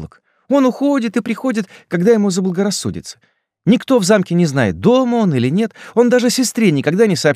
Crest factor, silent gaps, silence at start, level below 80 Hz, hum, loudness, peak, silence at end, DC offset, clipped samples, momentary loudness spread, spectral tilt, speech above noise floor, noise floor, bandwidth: 14 dB; none; 0 s; -52 dBFS; none; -15 LUFS; -2 dBFS; 0 s; under 0.1%; under 0.1%; 8 LU; -5.5 dB/octave; 21 dB; -35 dBFS; 15.5 kHz